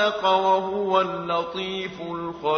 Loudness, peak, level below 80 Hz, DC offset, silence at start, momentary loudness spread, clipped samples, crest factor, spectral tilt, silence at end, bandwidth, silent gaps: -24 LUFS; -6 dBFS; -60 dBFS; under 0.1%; 0 s; 11 LU; under 0.1%; 16 dB; -5 dB/octave; 0 s; 6.6 kHz; none